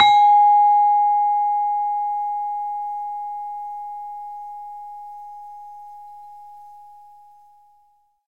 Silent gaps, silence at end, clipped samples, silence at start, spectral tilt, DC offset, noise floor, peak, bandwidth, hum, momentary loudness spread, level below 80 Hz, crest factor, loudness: none; 1.45 s; under 0.1%; 0 s; -0.5 dB/octave; 0.2%; -61 dBFS; -2 dBFS; 8 kHz; none; 26 LU; -68 dBFS; 18 dB; -19 LUFS